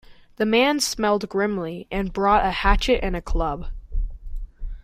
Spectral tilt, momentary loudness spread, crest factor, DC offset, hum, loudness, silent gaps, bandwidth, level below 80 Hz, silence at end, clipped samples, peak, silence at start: -4 dB/octave; 16 LU; 18 dB; under 0.1%; none; -22 LUFS; none; 15.5 kHz; -30 dBFS; 0 s; under 0.1%; -4 dBFS; 0.1 s